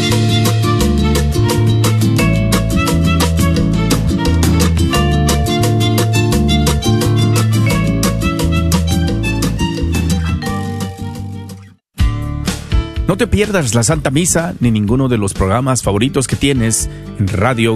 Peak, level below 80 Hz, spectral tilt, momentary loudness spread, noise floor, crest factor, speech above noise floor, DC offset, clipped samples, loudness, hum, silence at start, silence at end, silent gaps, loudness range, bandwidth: 0 dBFS; -22 dBFS; -5 dB/octave; 6 LU; -34 dBFS; 12 dB; 21 dB; under 0.1%; under 0.1%; -14 LUFS; none; 0 s; 0 s; none; 6 LU; 14 kHz